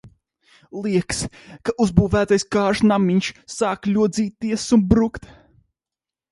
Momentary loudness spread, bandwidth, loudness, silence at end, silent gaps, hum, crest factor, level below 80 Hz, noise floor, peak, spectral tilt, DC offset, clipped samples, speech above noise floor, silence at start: 12 LU; 11.5 kHz; -20 LUFS; 1.15 s; none; none; 20 dB; -40 dBFS; -89 dBFS; 0 dBFS; -6 dB/octave; under 0.1%; under 0.1%; 70 dB; 0.05 s